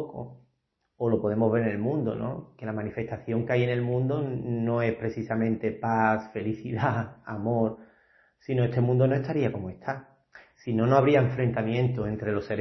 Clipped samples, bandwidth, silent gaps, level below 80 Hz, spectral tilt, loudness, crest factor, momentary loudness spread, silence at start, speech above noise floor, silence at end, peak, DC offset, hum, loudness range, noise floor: under 0.1%; 6.2 kHz; none; -60 dBFS; -9.5 dB/octave; -27 LUFS; 20 dB; 12 LU; 0 s; 49 dB; 0 s; -8 dBFS; under 0.1%; none; 3 LU; -76 dBFS